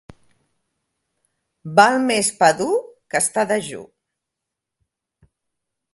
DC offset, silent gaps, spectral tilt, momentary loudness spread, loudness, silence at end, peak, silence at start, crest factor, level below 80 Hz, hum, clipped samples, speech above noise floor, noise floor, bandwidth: under 0.1%; none; -3 dB/octave; 15 LU; -18 LUFS; 2.1 s; 0 dBFS; 1.65 s; 22 dB; -64 dBFS; none; under 0.1%; 65 dB; -83 dBFS; 12 kHz